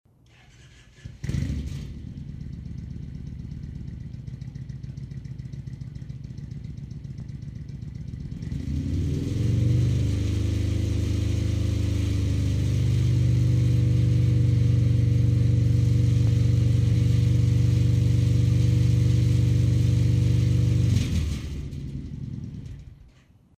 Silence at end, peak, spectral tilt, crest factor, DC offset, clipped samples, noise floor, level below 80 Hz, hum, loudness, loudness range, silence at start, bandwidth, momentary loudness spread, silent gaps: 0.55 s; -10 dBFS; -7.5 dB/octave; 12 dB; under 0.1%; under 0.1%; -55 dBFS; -34 dBFS; none; -23 LUFS; 16 LU; 1.05 s; 9.4 kHz; 16 LU; none